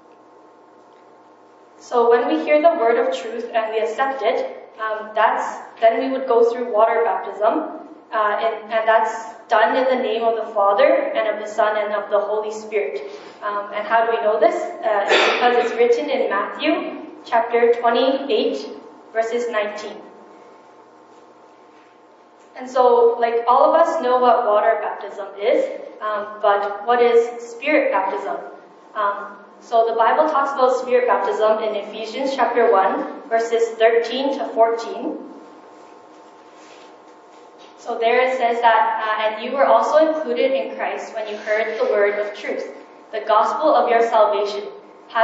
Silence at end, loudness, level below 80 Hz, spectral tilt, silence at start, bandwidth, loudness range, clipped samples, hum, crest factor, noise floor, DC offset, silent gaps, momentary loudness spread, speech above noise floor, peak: 0 s; -19 LUFS; -90 dBFS; 0 dB/octave; 1.85 s; 8 kHz; 5 LU; under 0.1%; none; 18 dB; -49 dBFS; under 0.1%; none; 13 LU; 30 dB; -2 dBFS